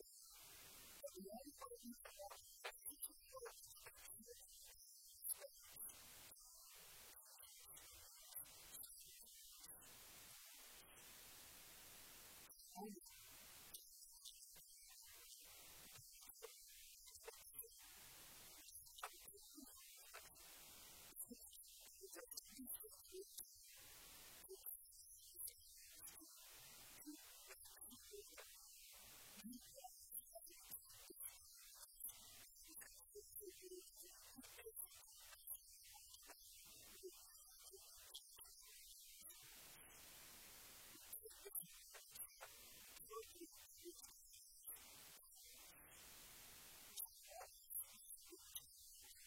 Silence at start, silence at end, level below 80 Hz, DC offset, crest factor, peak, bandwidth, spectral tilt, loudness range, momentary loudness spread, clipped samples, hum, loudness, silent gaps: 0 s; 0 s; -80 dBFS; under 0.1%; 28 dB; -32 dBFS; 16.5 kHz; -1 dB/octave; 4 LU; 7 LU; under 0.1%; none; -58 LUFS; none